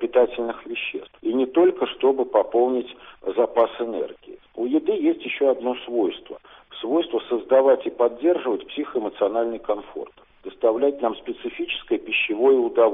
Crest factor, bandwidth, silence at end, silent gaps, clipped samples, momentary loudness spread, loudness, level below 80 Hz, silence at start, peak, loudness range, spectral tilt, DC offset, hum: 16 dB; 3.8 kHz; 0 s; none; under 0.1%; 15 LU; -22 LUFS; -60 dBFS; 0 s; -6 dBFS; 3 LU; -2 dB/octave; under 0.1%; none